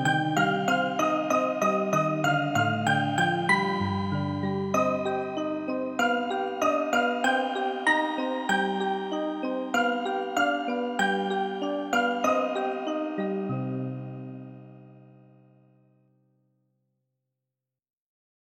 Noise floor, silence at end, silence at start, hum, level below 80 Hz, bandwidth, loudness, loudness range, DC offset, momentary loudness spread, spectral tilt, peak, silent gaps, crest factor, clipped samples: -88 dBFS; 3.5 s; 0 s; none; -70 dBFS; 16 kHz; -27 LUFS; 9 LU; under 0.1%; 6 LU; -5 dB/octave; -10 dBFS; none; 18 dB; under 0.1%